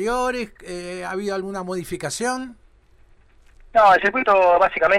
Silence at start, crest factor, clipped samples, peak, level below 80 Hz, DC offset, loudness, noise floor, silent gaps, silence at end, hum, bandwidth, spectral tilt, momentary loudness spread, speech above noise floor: 0 s; 14 dB; under 0.1%; -6 dBFS; -48 dBFS; under 0.1%; -20 LUFS; -52 dBFS; none; 0 s; none; 15 kHz; -4 dB/octave; 16 LU; 33 dB